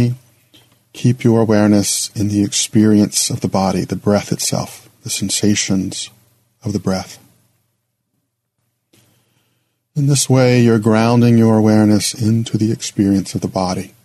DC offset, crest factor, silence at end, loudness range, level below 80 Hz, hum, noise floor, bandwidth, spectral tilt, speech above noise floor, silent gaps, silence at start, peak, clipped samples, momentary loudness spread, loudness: under 0.1%; 16 dB; 0.15 s; 15 LU; -54 dBFS; none; -70 dBFS; 13.5 kHz; -5 dB/octave; 56 dB; none; 0 s; 0 dBFS; under 0.1%; 12 LU; -15 LUFS